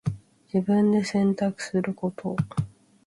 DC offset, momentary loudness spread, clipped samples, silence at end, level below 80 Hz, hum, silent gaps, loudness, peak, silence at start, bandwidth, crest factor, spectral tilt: under 0.1%; 11 LU; under 0.1%; 0.4 s; -56 dBFS; none; none; -26 LUFS; -12 dBFS; 0.05 s; 11.5 kHz; 14 dB; -7 dB/octave